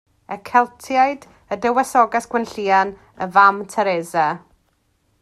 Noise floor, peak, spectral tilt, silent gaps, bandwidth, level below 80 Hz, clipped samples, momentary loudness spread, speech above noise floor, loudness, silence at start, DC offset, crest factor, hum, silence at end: -64 dBFS; 0 dBFS; -4.5 dB/octave; none; 14 kHz; -60 dBFS; under 0.1%; 16 LU; 46 dB; -18 LUFS; 0.3 s; under 0.1%; 20 dB; none; 0.85 s